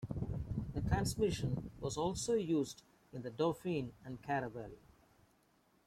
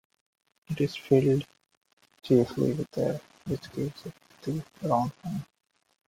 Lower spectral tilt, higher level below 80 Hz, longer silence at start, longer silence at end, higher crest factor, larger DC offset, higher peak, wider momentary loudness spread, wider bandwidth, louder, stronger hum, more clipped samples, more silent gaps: second, -6 dB/octave vs -8 dB/octave; first, -54 dBFS vs -62 dBFS; second, 0 s vs 0.7 s; first, 1.1 s vs 0.65 s; about the same, 20 dB vs 22 dB; neither; second, -20 dBFS vs -8 dBFS; about the same, 14 LU vs 16 LU; about the same, 15.5 kHz vs 16 kHz; second, -39 LUFS vs -29 LUFS; neither; neither; second, none vs 1.77-1.81 s, 1.93-1.97 s